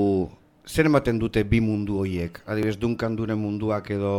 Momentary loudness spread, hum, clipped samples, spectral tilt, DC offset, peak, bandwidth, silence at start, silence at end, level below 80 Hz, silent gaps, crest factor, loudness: 8 LU; none; under 0.1%; -7.5 dB/octave; under 0.1%; -4 dBFS; 16.5 kHz; 0 s; 0 s; -42 dBFS; none; 20 dB; -25 LUFS